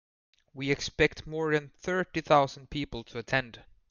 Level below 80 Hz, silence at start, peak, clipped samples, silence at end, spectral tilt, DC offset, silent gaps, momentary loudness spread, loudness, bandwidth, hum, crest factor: -52 dBFS; 0.55 s; -10 dBFS; under 0.1%; 0.3 s; -5 dB/octave; under 0.1%; none; 12 LU; -30 LUFS; 7.4 kHz; none; 22 dB